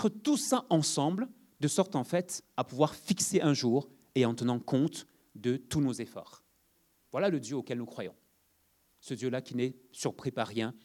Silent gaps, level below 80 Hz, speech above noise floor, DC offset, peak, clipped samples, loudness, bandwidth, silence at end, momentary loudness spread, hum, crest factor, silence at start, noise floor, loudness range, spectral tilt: none; -70 dBFS; 40 dB; under 0.1%; -12 dBFS; under 0.1%; -32 LUFS; 18 kHz; 0.1 s; 12 LU; none; 20 dB; 0 s; -71 dBFS; 7 LU; -5 dB/octave